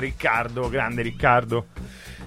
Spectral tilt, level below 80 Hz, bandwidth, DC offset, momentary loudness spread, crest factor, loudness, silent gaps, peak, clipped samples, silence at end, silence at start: -6 dB/octave; -40 dBFS; 15.5 kHz; under 0.1%; 19 LU; 20 dB; -23 LUFS; none; -4 dBFS; under 0.1%; 0 s; 0 s